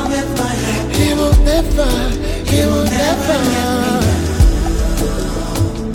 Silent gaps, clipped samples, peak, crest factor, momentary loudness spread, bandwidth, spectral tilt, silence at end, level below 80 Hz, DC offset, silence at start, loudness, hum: none; under 0.1%; -2 dBFS; 12 dB; 6 LU; 17 kHz; -5.5 dB/octave; 0 s; -18 dBFS; under 0.1%; 0 s; -15 LUFS; none